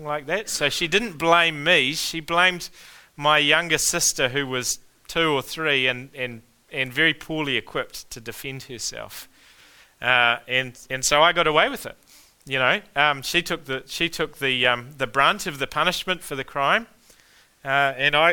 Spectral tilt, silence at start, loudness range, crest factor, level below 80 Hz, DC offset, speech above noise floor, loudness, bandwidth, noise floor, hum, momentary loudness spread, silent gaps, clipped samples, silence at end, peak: -2 dB/octave; 0 s; 6 LU; 22 dB; -52 dBFS; under 0.1%; 33 dB; -21 LUFS; 19 kHz; -56 dBFS; none; 14 LU; none; under 0.1%; 0 s; -2 dBFS